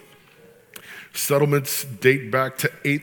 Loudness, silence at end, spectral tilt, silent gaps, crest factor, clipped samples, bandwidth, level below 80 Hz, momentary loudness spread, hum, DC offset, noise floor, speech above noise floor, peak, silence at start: -21 LUFS; 0 s; -4.5 dB/octave; none; 20 dB; under 0.1%; 19.5 kHz; -70 dBFS; 19 LU; none; under 0.1%; -51 dBFS; 30 dB; -4 dBFS; 0.75 s